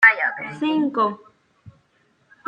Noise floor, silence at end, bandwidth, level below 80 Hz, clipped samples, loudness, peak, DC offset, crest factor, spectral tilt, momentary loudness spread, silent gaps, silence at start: -63 dBFS; 0.75 s; 9 kHz; -72 dBFS; under 0.1%; -21 LUFS; -2 dBFS; under 0.1%; 20 dB; -5.5 dB/octave; 8 LU; none; 0 s